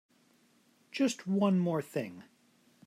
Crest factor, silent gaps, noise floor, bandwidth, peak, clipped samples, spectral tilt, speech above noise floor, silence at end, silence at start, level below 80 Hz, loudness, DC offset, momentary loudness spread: 18 dB; none; -68 dBFS; 14.5 kHz; -18 dBFS; under 0.1%; -6.5 dB/octave; 37 dB; 0.65 s; 0.95 s; -84 dBFS; -32 LUFS; under 0.1%; 16 LU